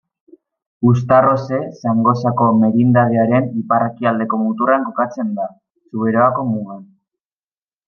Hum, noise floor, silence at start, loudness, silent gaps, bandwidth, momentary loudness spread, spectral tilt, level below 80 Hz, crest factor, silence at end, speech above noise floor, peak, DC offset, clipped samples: none; under -90 dBFS; 0.8 s; -16 LUFS; none; 6.6 kHz; 10 LU; -9.5 dB/octave; -60 dBFS; 16 dB; 1.05 s; over 75 dB; 0 dBFS; under 0.1%; under 0.1%